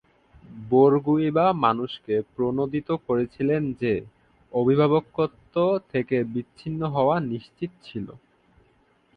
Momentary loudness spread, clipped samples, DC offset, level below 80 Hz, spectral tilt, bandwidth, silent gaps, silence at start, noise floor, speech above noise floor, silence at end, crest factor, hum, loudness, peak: 14 LU; under 0.1%; under 0.1%; -58 dBFS; -9.5 dB/octave; 5.2 kHz; none; 0.5 s; -63 dBFS; 39 dB; 1 s; 18 dB; none; -24 LUFS; -6 dBFS